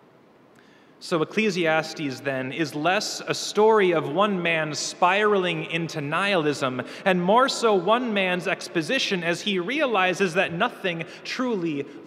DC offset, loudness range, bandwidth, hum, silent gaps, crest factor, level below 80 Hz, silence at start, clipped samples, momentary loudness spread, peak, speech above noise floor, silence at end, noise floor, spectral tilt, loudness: under 0.1%; 2 LU; 14.5 kHz; none; none; 20 dB; -76 dBFS; 1 s; under 0.1%; 9 LU; -4 dBFS; 31 dB; 0 s; -54 dBFS; -4 dB/octave; -23 LUFS